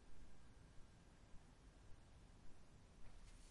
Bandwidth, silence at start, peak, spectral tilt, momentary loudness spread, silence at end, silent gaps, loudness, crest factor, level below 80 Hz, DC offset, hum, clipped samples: 11 kHz; 0 s; -46 dBFS; -5 dB/octave; 2 LU; 0 s; none; -68 LUFS; 12 dB; -66 dBFS; under 0.1%; none; under 0.1%